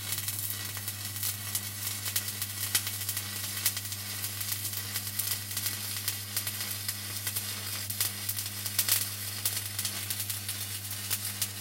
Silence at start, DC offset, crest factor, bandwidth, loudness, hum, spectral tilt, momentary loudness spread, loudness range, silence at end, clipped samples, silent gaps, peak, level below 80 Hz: 0 s; under 0.1%; 26 dB; 17 kHz; -31 LUFS; none; -1 dB/octave; 5 LU; 2 LU; 0 s; under 0.1%; none; -8 dBFS; -70 dBFS